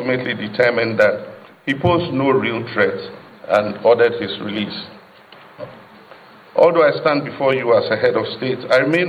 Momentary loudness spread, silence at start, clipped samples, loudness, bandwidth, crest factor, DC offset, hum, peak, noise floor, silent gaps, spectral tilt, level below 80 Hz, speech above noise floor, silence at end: 18 LU; 0 s; under 0.1%; -17 LUFS; 9 kHz; 18 dB; under 0.1%; none; -2 dBFS; -44 dBFS; none; -7 dB/octave; -56 dBFS; 27 dB; 0 s